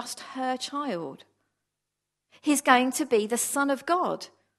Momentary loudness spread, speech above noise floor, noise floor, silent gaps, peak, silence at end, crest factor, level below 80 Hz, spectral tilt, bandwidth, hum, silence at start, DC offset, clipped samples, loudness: 14 LU; 58 dB; -84 dBFS; none; -2 dBFS; 0.3 s; 26 dB; -80 dBFS; -2.5 dB/octave; 13 kHz; 50 Hz at -80 dBFS; 0 s; under 0.1%; under 0.1%; -26 LUFS